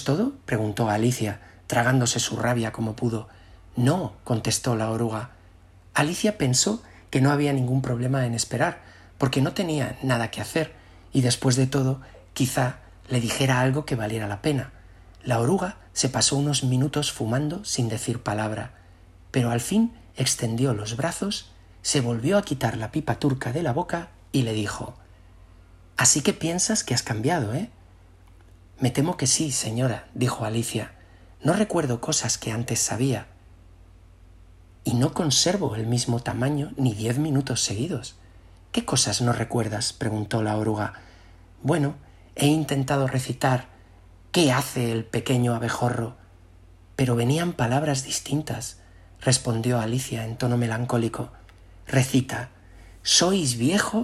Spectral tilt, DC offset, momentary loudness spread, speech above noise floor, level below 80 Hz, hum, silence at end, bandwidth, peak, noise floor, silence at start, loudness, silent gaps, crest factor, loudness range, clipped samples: -4.5 dB/octave; under 0.1%; 10 LU; 27 dB; -52 dBFS; none; 0 s; 14 kHz; -4 dBFS; -51 dBFS; 0 s; -24 LUFS; none; 20 dB; 2 LU; under 0.1%